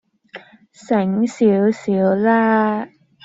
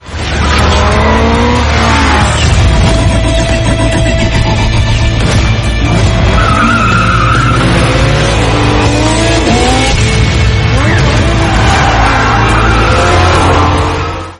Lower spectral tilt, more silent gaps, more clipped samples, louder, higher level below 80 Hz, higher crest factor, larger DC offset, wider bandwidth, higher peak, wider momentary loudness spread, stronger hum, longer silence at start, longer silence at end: first, -7.5 dB/octave vs -5 dB/octave; neither; neither; second, -17 LUFS vs -9 LUFS; second, -62 dBFS vs -14 dBFS; first, 14 dB vs 8 dB; neither; second, 8 kHz vs 11.5 kHz; second, -4 dBFS vs 0 dBFS; first, 6 LU vs 3 LU; neither; first, 0.35 s vs 0.05 s; first, 0.4 s vs 0.05 s